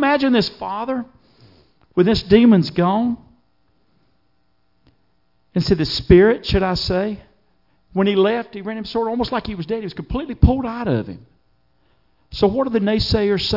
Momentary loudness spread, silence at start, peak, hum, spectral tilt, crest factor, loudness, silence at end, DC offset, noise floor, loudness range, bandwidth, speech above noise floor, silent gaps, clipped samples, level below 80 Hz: 14 LU; 0 s; 0 dBFS; none; -7.5 dB/octave; 18 dB; -18 LUFS; 0 s; under 0.1%; -66 dBFS; 5 LU; 5.8 kHz; 49 dB; none; under 0.1%; -34 dBFS